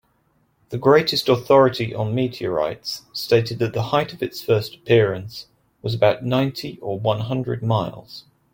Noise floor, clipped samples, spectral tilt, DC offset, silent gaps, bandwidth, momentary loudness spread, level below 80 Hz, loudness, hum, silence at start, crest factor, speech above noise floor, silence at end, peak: -64 dBFS; under 0.1%; -6.5 dB/octave; under 0.1%; none; 17 kHz; 15 LU; -56 dBFS; -21 LUFS; none; 0.7 s; 18 dB; 44 dB; 0.35 s; -2 dBFS